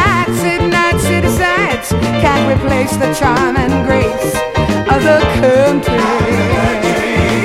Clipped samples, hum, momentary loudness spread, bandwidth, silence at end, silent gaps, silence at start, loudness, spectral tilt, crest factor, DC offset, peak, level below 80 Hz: under 0.1%; none; 4 LU; 16.5 kHz; 0 s; none; 0 s; -12 LUFS; -5.5 dB/octave; 12 dB; under 0.1%; 0 dBFS; -26 dBFS